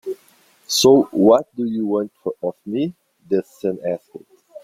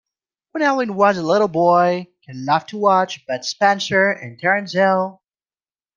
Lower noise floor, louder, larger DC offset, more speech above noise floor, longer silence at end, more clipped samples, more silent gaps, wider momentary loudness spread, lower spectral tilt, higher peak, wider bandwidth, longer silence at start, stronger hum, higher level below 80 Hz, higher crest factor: second, -55 dBFS vs under -90 dBFS; about the same, -19 LUFS vs -18 LUFS; neither; second, 37 dB vs over 72 dB; second, 0.05 s vs 0.85 s; neither; neither; first, 14 LU vs 10 LU; about the same, -4.5 dB/octave vs -5 dB/octave; about the same, -2 dBFS vs -2 dBFS; first, 16 kHz vs 7.4 kHz; second, 0.05 s vs 0.55 s; neither; first, -60 dBFS vs -66 dBFS; about the same, 18 dB vs 18 dB